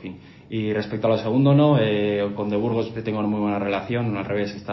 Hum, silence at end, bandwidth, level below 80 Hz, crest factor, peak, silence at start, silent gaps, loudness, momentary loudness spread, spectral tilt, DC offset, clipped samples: none; 0 s; 6 kHz; -54 dBFS; 16 dB; -6 dBFS; 0 s; none; -22 LUFS; 10 LU; -9 dB/octave; under 0.1%; under 0.1%